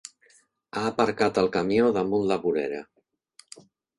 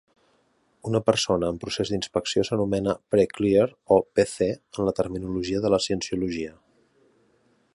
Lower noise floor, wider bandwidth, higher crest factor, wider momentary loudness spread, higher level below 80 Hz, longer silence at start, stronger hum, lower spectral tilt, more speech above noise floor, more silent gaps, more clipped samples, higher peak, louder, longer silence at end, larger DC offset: second, -62 dBFS vs -66 dBFS; about the same, 11.5 kHz vs 11.5 kHz; about the same, 20 dB vs 20 dB; first, 12 LU vs 7 LU; second, -60 dBFS vs -52 dBFS; about the same, 0.75 s vs 0.85 s; neither; about the same, -5.5 dB/octave vs -5 dB/octave; second, 37 dB vs 42 dB; neither; neither; about the same, -6 dBFS vs -4 dBFS; about the same, -25 LUFS vs -25 LUFS; second, 0.4 s vs 1.25 s; neither